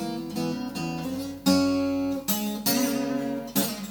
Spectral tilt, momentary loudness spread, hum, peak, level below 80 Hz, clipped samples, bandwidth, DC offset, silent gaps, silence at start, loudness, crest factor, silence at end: -4 dB/octave; 8 LU; none; -8 dBFS; -58 dBFS; under 0.1%; over 20 kHz; under 0.1%; none; 0 s; -27 LUFS; 18 dB; 0 s